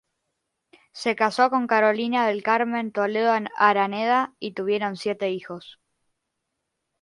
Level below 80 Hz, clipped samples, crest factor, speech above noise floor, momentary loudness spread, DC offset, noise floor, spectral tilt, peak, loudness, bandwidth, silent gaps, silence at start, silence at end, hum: -74 dBFS; under 0.1%; 22 dB; 57 dB; 9 LU; under 0.1%; -80 dBFS; -5 dB/octave; -4 dBFS; -23 LUFS; 11.5 kHz; none; 0.95 s; 1.3 s; none